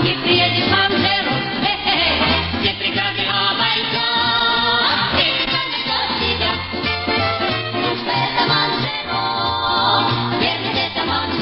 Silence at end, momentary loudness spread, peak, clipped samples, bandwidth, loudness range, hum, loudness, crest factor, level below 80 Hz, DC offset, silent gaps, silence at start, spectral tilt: 0 s; 5 LU; -2 dBFS; under 0.1%; 5.8 kHz; 2 LU; none; -17 LUFS; 16 dB; -42 dBFS; under 0.1%; none; 0 s; -8.5 dB/octave